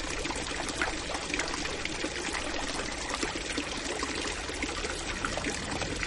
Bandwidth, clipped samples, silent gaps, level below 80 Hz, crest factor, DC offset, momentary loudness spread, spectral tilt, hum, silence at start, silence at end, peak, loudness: 11.5 kHz; under 0.1%; none; -44 dBFS; 20 dB; under 0.1%; 2 LU; -2.5 dB/octave; none; 0 s; 0 s; -14 dBFS; -32 LUFS